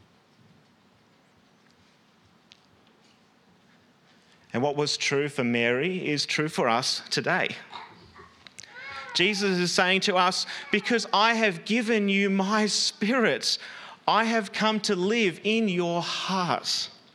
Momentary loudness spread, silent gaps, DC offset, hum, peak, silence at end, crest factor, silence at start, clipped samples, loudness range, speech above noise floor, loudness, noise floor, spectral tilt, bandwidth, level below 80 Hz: 9 LU; none; under 0.1%; none; -4 dBFS; 0.2 s; 24 dB; 4.55 s; under 0.1%; 5 LU; 36 dB; -25 LUFS; -61 dBFS; -3.5 dB/octave; 14 kHz; -76 dBFS